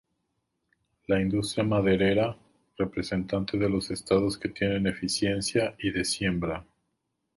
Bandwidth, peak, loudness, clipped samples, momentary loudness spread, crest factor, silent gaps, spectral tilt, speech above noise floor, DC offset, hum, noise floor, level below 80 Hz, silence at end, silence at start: 11.5 kHz; -8 dBFS; -27 LUFS; under 0.1%; 8 LU; 20 dB; none; -5 dB/octave; 52 dB; under 0.1%; none; -79 dBFS; -50 dBFS; 0.75 s; 1.1 s